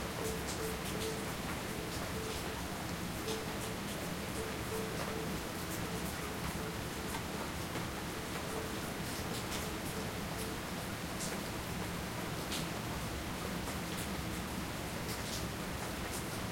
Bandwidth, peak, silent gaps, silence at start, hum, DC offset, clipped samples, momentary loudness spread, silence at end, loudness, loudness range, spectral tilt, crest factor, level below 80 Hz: 16.5 kHz; -24 dBFS; none; 0 s; none; under 0.1%; under 0.1%; 2 LU; 0 s; -39 LUFS; 0 LU; -4 dB/octave; 16 dB; -52 dBFS